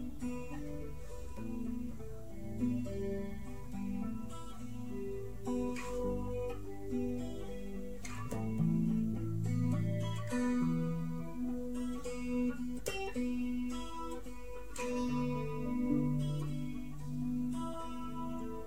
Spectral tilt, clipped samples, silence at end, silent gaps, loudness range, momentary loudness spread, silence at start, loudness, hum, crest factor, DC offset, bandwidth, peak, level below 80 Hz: -7 dB/octave; under 0.1%; 0 s; none; 6 LU; 12 LU; 0 s; -39 LUFS; none; 16 dB; 0.7%; 16 kHz; -20 dBFS; -52 dBFS